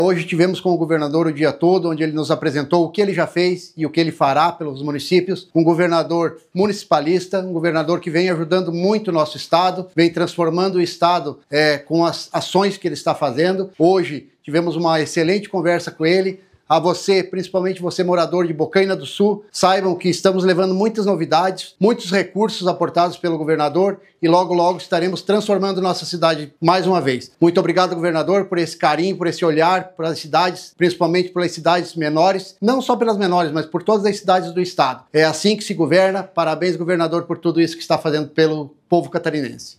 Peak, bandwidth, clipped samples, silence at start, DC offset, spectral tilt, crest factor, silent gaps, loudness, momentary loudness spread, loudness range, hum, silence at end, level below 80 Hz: 0 dBFS; 14 kHz; under 0.1%; 0 s; under 0.1%; -5.5 dB/octave; 18 dB; none; -18 LUFS; 5 LU; 1 LU; none; 0.05 s; -70 dBFS